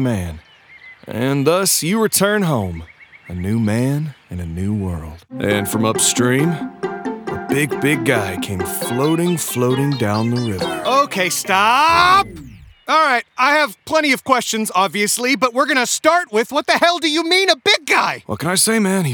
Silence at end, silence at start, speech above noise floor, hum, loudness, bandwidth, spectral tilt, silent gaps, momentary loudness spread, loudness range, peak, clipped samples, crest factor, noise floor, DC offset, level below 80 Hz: 0 s; 0 s; 26 dB; none; -16 LUFS; over 20 kHz; -3.5 dB/octave; none; 12 LU; 4 LU; 0 dBFS; under 0.1%; 18 dB; -43 dBFS; under 0.1%; -50 dBFS